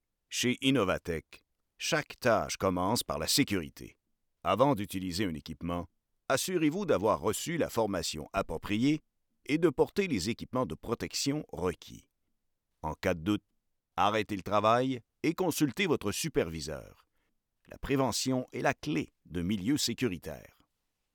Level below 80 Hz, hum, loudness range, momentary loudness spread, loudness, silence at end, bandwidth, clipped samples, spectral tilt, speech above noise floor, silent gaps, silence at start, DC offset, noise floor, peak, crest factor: -58 dBFS; none; 4 LU; 12 LU; -31 LUFS; 0.75 s; over 20 kHz; under 0.1%; -4.5 dB/octave; 50 dB; none; 0.3 s; under 0.1%; -81 dBFS; -12 dBFS; 20 dB